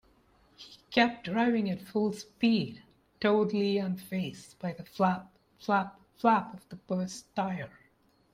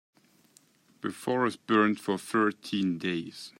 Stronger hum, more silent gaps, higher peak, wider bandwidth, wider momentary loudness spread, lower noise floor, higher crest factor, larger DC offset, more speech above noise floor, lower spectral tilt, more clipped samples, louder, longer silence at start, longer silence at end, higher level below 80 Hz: neither; neither; about the same, -10 dBFS vs -12 dBFS; about the same, 15.5 kHz vs 16 kHz; first, 13 LU vs 10 LU; first, -67 dBFS vs -63 dBFS; about the same, 20 dB vs 20 dB; neither; about the same, 37 dB vs 34 dB; about the same, -6 dB/octave vs -5.5 dB/octave; neither; about the same, -30 LUFS vs -29 LUFS; second, 0.6 s vs 1.05 s; first, 0.65 s vs 0.1 s; first, -70 dBFS vs -76 dBFS